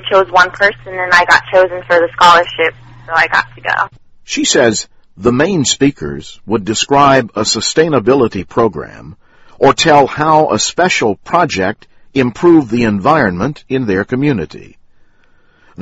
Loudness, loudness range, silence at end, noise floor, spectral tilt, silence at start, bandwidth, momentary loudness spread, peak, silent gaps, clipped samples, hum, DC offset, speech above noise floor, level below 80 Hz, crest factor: -12 LUFS; 3 LU; 0 s; -48 dBFS; -4 dB/octave; 0.05 s; 10.5 kHz; 11 LU; 0 dBFS; none; 0.3%; none; under 0.1%; 36 dB; -42 dBFS; 12 dB